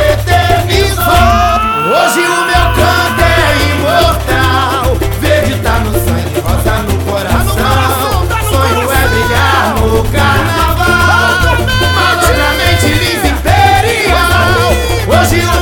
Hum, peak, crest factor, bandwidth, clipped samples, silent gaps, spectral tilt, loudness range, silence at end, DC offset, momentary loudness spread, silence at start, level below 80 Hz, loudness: none; 0 dBFS; 10 dB; over 20 kHz; 0.2%; none; -4.5 dB/octave; 3 LU; 0 s; under 0.1%; 4 LU; 0 s; -18 dBFS; -10 LUFS